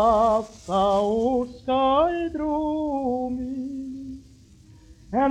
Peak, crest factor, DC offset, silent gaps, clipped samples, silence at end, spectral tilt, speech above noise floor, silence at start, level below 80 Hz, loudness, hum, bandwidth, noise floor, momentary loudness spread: -8 dBFS; 16 dB; under 0.1%; none; under 0.1%; 0 s; -6.5 dB/octave; 27 dB; 0 s; -48 dBFS; -24 LUFS; none; 10.5 kHz; -50 dBFS; 13 LU